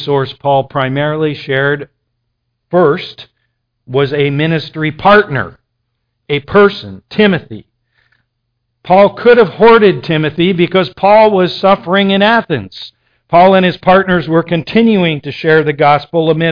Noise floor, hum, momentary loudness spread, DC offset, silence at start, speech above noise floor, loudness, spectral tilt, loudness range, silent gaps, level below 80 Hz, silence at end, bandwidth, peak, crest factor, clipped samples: -68 dBFS; none; 11 LU; under 0.1%; 0 s; 58 dB; -11 LUFS; -8.5 dB/octave; 6 LU; none; -46 dBFS; 0 s; 5.2 kHz; 0 dBFS; 12 dB; 0.1%